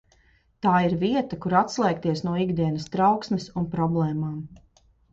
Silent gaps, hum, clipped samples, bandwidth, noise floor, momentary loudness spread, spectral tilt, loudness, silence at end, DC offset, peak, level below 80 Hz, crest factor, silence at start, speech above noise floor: none; none; under 0.1%; 7.8 kHz; -61 dBFS; 8 LU; -7 dB/octave; -24 LUFS; 0.55 s; under 0.1%; -6 dBFS; -54 dBFS; 18 dB; 0.65 s; 37 dB